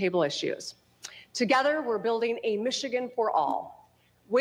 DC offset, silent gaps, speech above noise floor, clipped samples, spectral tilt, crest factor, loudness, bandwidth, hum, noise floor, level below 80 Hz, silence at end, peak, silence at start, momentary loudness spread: under 0.1%; none; 34 dB; under 0.1%; -3.5 dB/octave; 16 dB; -28 LUFS; 14 kHz; 60 Hz at -65 dBFS; -61 dBFS; -76 dBFS; 0 s; -12 dBFS; 0 s; 18 LU